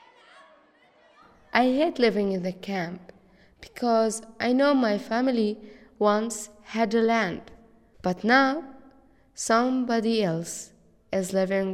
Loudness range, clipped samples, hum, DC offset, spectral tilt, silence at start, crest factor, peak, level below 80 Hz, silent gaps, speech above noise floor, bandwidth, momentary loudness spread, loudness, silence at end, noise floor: 2 LU; under 0.1%; none; under 0.1%; -4.5 dB/octave; 1.55 s; 22 dB; -6 dBFS; -62 dBFS; none; 35 dB; 14.5 kHz; 14 LU; -25 LUFS; 0 s; -59 dBFS